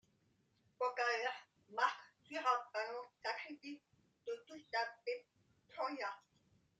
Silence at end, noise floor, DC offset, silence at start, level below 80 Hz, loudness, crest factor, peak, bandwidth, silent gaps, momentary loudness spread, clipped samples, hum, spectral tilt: 0.6 s; -78 dBFS; under 0.1%; 0.8 s; under -90 dBFS; -42 LUFS; 24 dB; -20 dBFS; 9.2 kHz; none; 16 LU; under 0.1%; none; -2 dB/octave